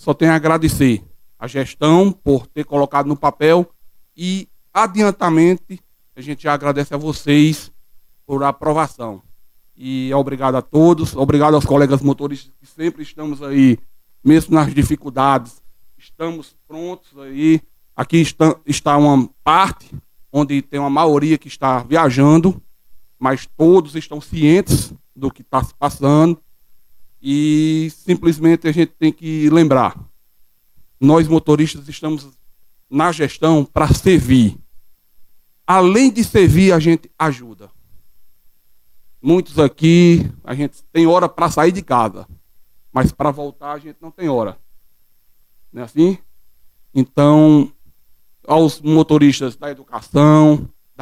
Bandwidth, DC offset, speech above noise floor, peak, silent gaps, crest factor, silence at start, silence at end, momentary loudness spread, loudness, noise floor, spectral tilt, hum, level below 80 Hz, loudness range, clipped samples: 15.5 kHz; under 0.1%; 39 dB; 0 dBFS; none; 14 dB; 0.05 s; 0.35 s; 15 LU; -15 LUFS; -54 dBFS; -6.5 dB/octave; none; -40 dBFS; 5 LU; under 0.1%